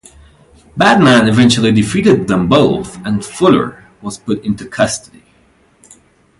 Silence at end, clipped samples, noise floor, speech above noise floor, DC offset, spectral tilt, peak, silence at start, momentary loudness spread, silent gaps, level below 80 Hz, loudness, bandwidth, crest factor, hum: 1.4 s; under 0.1%; -51 dBFS; 40 dB; under 0.1%; -5.5 dB/octave; 0 dBFS; 0.75 s; 15 LU; none; -42 dBFS; -12 LUFS; 11.5 kHz; 14 dB; none